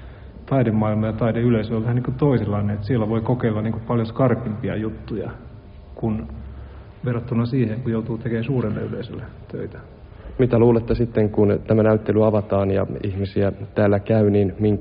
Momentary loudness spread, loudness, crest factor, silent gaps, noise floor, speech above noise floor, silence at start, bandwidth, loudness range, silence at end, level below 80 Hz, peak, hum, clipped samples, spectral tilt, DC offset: 17 LU; -21 LUFS; 16 dB; none; -40 dBFS; 20 dB; 0 s; 5.2 kHz; 7 LU; 0 s; -42 dBFS; -4 dBFS; none; under 0.1%; -8.5 dB/octave; under 0.1%